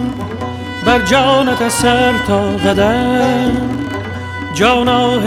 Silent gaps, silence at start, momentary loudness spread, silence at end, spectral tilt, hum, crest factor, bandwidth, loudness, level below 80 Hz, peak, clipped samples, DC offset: none; 0 s; 12 LU; 0 s; -4.5 dB/octave; none; 12 dB; 16 kHz; -14 LUFS; -34 dBFS; -2 dBFS; under 0.1%; under 0.1%